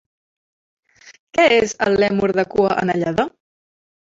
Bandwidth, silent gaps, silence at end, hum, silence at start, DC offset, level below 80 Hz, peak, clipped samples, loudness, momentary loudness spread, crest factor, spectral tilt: 7.8 kHz; 1.19-1.27 s; 0.9 s; none; 1.05 s; under 0.1%; -52 dBFS; -2 dBFS; under 0.1%; -18 LUFS; 8 LU; 18 dB; -5 dB/octave